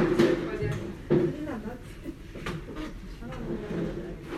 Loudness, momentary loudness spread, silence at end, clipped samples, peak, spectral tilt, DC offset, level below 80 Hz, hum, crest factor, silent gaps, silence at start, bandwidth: -31 LUFS; 16 LU; 0 s; under 0.1%; -10 dBFS; -7 dB/octave; under 0.1%; -44 dBFS; none; 20 dB; none; 0 s; 13.5 kHz